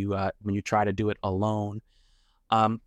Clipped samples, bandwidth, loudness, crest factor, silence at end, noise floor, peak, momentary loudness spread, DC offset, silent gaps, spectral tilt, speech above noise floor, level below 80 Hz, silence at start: under 0.1%; 9 kHz; -28 LUFS; 18 dB; 0.1 s; -64 dBFS; -10 dBFS; 7 LU; under 0.1%; none; -7 dB/octave; 37 dB; -58 dBFS; 0 s